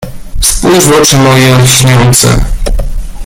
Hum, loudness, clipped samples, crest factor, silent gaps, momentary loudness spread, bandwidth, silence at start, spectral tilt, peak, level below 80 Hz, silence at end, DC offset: none; -6 LUFS; 0.7%; 6 dB; none; 12 LU; over 20 kHz; 0 s; -4 dB/octave; 0 dBFS; -14 dBFS; 0 s; under 0.1%